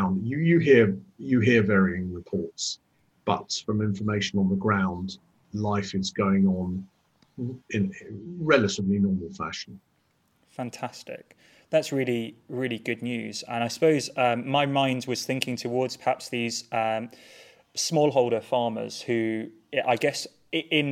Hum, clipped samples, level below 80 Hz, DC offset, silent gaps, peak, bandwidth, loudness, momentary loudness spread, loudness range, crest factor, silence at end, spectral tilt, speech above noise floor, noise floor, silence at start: none; under 0.1%; -62 dBFS; under 0.1%; none; -4 dBFS; 15 kHz; -26 LUFS; 14 LU; 5 LU; 22 dB; 0 s; -5.5 dB/octave; 43 dB; -69 dBFS; 0 s